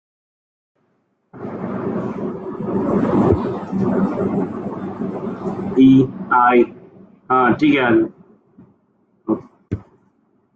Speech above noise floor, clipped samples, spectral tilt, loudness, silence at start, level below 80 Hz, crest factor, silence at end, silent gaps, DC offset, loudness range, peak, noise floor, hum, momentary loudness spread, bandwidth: 50 dB; under 0.1%; -9 dB/octave; -18 LUFS; 1.35 s; -50 dBFS; 18 dB; 0.75 s; none; under 0.1%; 6 LU; -2 dBFS; -65 dBFS; none; 15 LU; 6.8 kHz